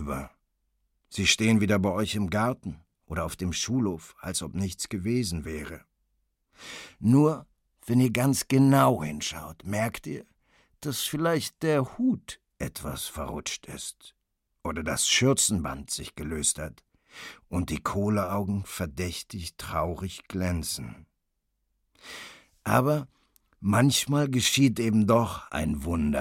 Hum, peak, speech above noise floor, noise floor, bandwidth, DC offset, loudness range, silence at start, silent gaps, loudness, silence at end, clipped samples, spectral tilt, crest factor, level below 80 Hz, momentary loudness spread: none; -6 dBFS; 51 dB; -78 dBFS; 17 kHz; under 0.1%; 8 LU; 0 s; none; -27 LUFS; 0 s; under 0.1%; -4.5 dB/octave; 22 dB; -48 dBFS; 18 LU